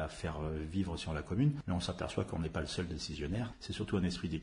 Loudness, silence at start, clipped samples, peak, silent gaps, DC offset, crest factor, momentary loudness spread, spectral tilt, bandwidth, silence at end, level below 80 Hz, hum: -37 LUFS; 0 s; under 0.1%; -20 dBFS; none; under 0.1%; 16 dB; 7 LU; -6 dB/octave; 10.5 kHz; 0 s; -52 dBFS; none